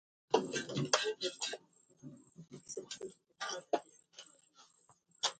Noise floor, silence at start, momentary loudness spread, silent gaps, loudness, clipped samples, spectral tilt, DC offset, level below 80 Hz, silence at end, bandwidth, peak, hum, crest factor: -70 dBFS; 0.3 s; 23 LU; none; -38 LUFS; under 0.1%; -2.5 dB/octave; under 0.1%; -84 dBFS; 0.05 s; 9.4 kHz; -12 dBFS; none; 30 dB